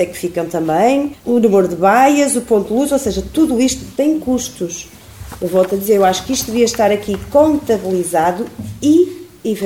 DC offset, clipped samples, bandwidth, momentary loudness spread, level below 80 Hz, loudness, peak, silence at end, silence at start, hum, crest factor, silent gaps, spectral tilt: 0.2%; under 0.1%; 17 kHz; 10 LU; -42 dBFS; -15 LUFS; 0 dBFS; 0 s; 0 s; none; 14 dB; none; -4.5 dB/octave